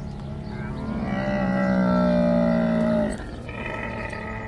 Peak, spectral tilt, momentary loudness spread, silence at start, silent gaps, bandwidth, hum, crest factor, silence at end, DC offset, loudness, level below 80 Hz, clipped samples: -10 dBFS; -8 dB/octave; 13 LU; 0 s; none; 10.5 kHz; none; 12 dB; 0 s; under 0.1%; -24 LUFS; -40 dBFS; under 0.1%